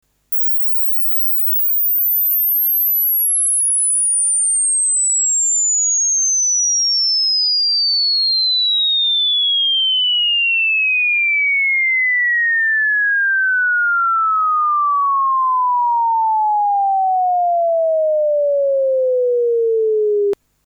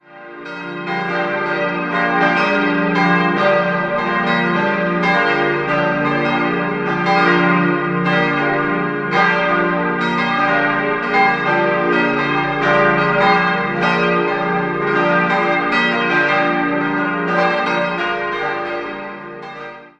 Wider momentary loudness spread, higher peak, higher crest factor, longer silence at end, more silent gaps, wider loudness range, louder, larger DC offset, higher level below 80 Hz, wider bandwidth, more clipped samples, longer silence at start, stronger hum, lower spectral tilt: second, 4 LU vs 7 LU; second, -12 dBFS vs -2 dBFS; second, 4 dB vs 16 dB; first, 0.3 s vs 0.1 s; neither; about the same, 3 LU vs 2 LU; first, -13 LUFS vs -16 LUFS; neither; second, -68 dBFS vs -52 dBFS; first, over 20 kHz vs 8.2 kHz; neither; first, 0.3 s vs 0.1 s; first, 50 Hz at -70 dBFS vs none; second, 4 dB/octave vs -6.5 dB/octave